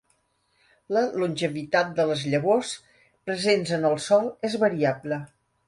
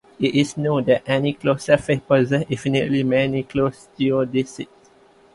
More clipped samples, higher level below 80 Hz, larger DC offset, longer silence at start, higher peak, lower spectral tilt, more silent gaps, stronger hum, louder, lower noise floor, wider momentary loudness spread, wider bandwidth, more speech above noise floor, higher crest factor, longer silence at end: neither; second, -68 dBFS vs -52 dBFS; neither; first, 0.9 s vs 0.2 s; second, -8 dBFS vs -2 dBFS; second, -5 dB/octave vs -6.5 dB/octave; neither; neither; second, -25 LUFS vs -20 LUFS; first, -69 dBFS vs -52 dBFS; first, 10 LU vs 6 LU; about the same, 11.5 kHz vs 11.5 kHz; first, 45 dB vs 33 dB; about the same, 18 dB vs 18 dB; second, 0.4 s vs 0.7 s